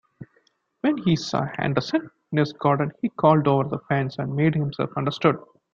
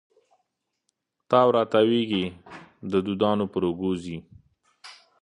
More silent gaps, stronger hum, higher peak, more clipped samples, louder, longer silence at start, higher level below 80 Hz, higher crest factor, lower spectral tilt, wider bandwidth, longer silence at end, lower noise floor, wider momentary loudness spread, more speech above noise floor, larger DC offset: neither; neither; about the same, -4 dBFS vs -4 dBFS; neither; about the same, -23 LUFS vs -24 LUFS; second, 0.2 s vs 1.3 s; about the same, -58 dBFS vs -58 dBFS; about the same, 20 dB vs 22 dB; about the same, -7.5 dB/octave vs -7 dB/octave; second, 7.4 kHz vs 10.5 kHz; about the same, 0.3 s vs 0.3 s; second, -66 dBFS vs -78 dBFS; second, 8 LU vs 19 LU; second, 43 dB vs 54 dB; neither